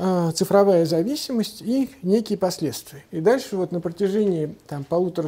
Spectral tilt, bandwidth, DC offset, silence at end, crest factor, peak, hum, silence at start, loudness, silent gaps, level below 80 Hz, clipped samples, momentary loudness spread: -6 dB/octave; 16 kHz; under 0.1%; 0 s; 18 dB; -4 dBFS; none; 0 s; -22 LUFS; none; -60 dBFS; under 0.1%; 10 LU